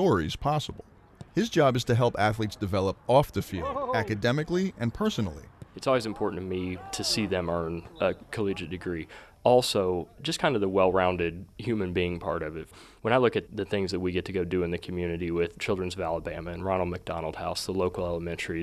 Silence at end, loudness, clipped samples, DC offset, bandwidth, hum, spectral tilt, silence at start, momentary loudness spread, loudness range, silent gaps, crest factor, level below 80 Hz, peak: 0 s; -28 LUFS; under 0.1%; under 0.1%; 13.5 kHz; none; -5.5 dB/octave; 0 s; 10 LU; 4 LU; none; 20 dB; -52 dBFS; -8 dBFS